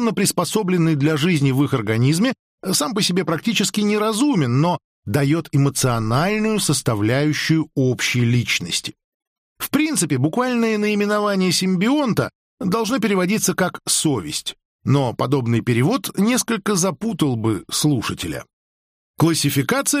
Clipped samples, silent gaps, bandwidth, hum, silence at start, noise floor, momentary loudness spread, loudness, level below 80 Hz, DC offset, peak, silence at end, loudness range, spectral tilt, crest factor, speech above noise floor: under 0.1%; 2.39-2.58 s, 4.84-5.02 s, 9.04-9.20 s, 9.27-9.56 s, 12.35-12.58 s, 14.65-14.79 s, 18.53-19.14 s; 15.5 kHz; none; 0 s; under -90 dBFS; 5 LU; -19 LUFS; -52 dBFS; under 0.1%; -6 dBFS; 0 s; 2 LU; -4.5 dB/octave; 14 dB; over 71 dB